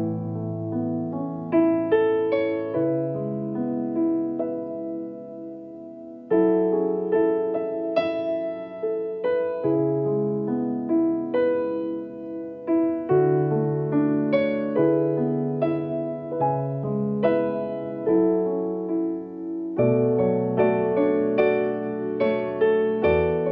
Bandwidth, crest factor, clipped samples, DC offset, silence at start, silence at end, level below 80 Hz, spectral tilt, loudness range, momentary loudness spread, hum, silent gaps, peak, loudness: 5 kHz; 14 dB; under 0.1%; under 0.1%; 0 s; 0 s; -56 dBFS; -7.5 dB/octave; 3 LU; 10 LU; none; none; -10 dBFS; -24 LUFS